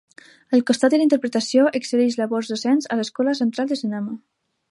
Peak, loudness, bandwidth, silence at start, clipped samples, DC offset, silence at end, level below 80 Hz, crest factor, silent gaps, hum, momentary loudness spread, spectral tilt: -4 dBFS; -20 LUFS; 11.5 kHz; 0.5 s; under 0.1%; under 0.1%; 0.55 s; -74 dBFS; 16 dB; none; none; 8 LU; -4.5 dB/octave